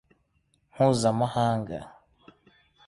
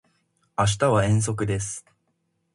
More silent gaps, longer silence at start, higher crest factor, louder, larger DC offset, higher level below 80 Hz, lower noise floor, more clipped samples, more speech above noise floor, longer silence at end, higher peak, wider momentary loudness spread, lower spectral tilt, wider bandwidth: neither; first, 0.75 s vs 0.6 s; about the same, 20 dB vs 18 dB; about the same, -26 LUFS vs -24 LUFS; neither; second, -58 dBFS vs -48 dBFS; about the same, -70 dBFS vs -73 dBFS; neither; second, 46 dB vs 50 dB; first, 1 s vs 0.75 s; about the same, -8 dBFS vs -6 dBFS; about the same, 14 LU vs 13 LU; first, -6.5 dB/octave vs -5 dB/octave; about the same, 11.5 kHz vs 11.5 kHz